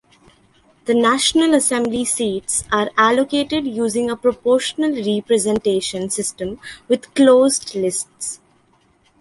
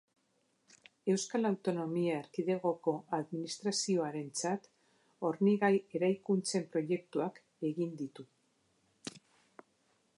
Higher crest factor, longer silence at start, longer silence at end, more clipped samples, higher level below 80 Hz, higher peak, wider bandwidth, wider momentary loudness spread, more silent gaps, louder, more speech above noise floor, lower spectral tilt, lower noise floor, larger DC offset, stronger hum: about the same, 18 dB vs 18 dB; second, 0.85 s vs 1.05 s; second, 0.85 s vs 1 s; neither; first, -54 dBFS vs -86 dBFS; first, -2 dBFS vs -18 dBFS; about the same, 12 kHz vs 11.5 kHz; about the same, 11 LU vs 10 LU; neither; first, -18 LUFS vs -35 LUFS; about the same, 40 dB vs 42 dB; second, -3 dB/octave vs -5 dB/octave; second, -58 dBFS vs -76 dBFS; neither; neither